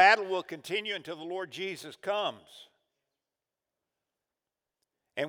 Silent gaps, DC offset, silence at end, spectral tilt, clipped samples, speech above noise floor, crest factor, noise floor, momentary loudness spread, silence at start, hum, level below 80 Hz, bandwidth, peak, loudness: none; under 0.1%; 0 s; -3 dB/octave; under 0.1%; 55 dB; 24 dB; -90 dBFS; 12 LU; 0 s; none; under -90 dBFS; 18 kHz; -8 dBFS; -32 LUFS